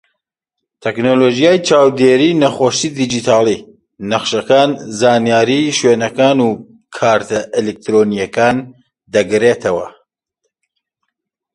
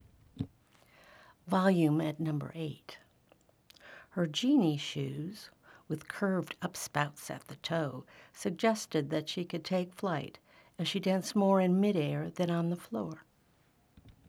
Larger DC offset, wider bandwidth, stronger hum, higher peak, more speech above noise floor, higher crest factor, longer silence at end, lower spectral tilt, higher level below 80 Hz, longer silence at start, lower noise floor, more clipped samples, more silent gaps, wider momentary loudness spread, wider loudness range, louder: neither; second, 11.5 kHz vs 15.5 kHz; neither; first, 0 dBFS vs -14 dBFS; first, 66 dB vs 36 dB; second, 14 dB vs 20 dB; first, 1.65 s vs 0.15 s; second, -4.5 dB/octave vs -6 dB/octave; first, -54 dBFS vs -72 dBFS; first, 0.85 s vs 0.35 s; first, -78 dBFS vs -68 dBFS; neither; neither; second, 9 LU vs 16 LU; about the same, 4 LU vs 4 LU; first, -13 LUFS vs -33 LUFS